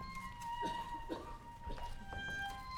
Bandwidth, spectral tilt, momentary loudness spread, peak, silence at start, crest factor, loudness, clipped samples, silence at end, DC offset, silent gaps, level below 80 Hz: 18 kHz; -4 dB/octave; 8 LU; -28 dBFS; 0 s; 16 dB; -45 LUFS; under 0.1%; 0 s; under 0.1%; none; -52 dBFS